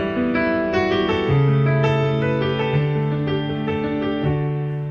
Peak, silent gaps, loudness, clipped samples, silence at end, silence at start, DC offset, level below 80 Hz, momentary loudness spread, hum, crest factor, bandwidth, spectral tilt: -8 dBFS; none; -20 LUFS; under 0.1%; 0 s; 0 s; under 0.1%; -44 dBFS; 5 LU; none; 12 dB; 6.8 kHz; -8.5 dB/octave